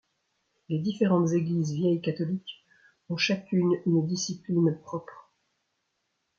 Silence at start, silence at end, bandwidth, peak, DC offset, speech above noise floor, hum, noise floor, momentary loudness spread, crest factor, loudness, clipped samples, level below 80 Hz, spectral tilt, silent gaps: 0.7 s; 1.2 s; 7.4 kHz; -12 dBFS; under 0.1%; 52 dB; none; -78 dBFS; 11 LU; 18 dB; -27 LUFS; under 0.1%; -72 dBFS; -6 dB/octave; none